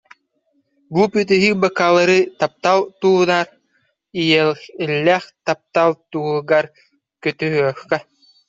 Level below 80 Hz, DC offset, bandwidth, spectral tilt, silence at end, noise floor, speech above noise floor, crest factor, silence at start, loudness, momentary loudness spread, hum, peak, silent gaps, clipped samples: -62 dBFS; under 0.1%; 7.8 kHz; -5.5 dB/octave; 0.45 s; -66 dBFS; 49 dB; 16 dB; 0.9 s; -17 LUFS; 10 LU; none; -2 dBFS; none; under 0.1%